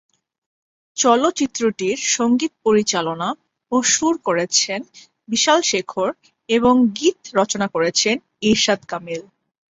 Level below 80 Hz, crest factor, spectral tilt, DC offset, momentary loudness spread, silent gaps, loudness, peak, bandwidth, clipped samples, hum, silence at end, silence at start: -58 dBFS; 18 dB; -2.5 dB/octave; under 0.1%; 11 LU; none; -18 LUFS; -2 dBFS; 8 kHz; under 0.1%; none; 0.5 s; 0.95 s